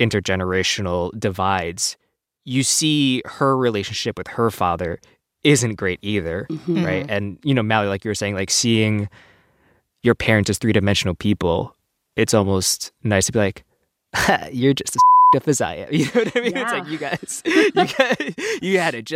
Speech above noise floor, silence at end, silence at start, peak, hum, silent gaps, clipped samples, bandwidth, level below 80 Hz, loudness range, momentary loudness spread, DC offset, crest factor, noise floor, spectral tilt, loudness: 41 dB; 0 s; 0 s; 0 dBFS; none; none; under 0.1%; 16 kHz; -48 dBFS; 4 LU; 8 LU; under 0.1%; 18 dB; -61 dBFS; -4 dB/octave; -19 LUFS